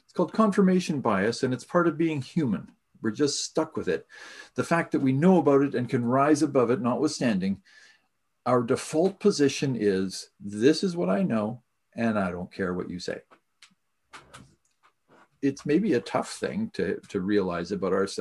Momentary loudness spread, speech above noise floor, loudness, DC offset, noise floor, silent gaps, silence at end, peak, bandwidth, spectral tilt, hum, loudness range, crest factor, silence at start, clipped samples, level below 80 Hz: 11 LU; 47 dB; -26 LUFS; under 0.1%; -73 dBFS; none; 0 s; -8 dBFS; 12 kHz; -6 dB/octave; none; 9 LU; 18 dB; 0.15 s; under 0.1%; -60 dBFS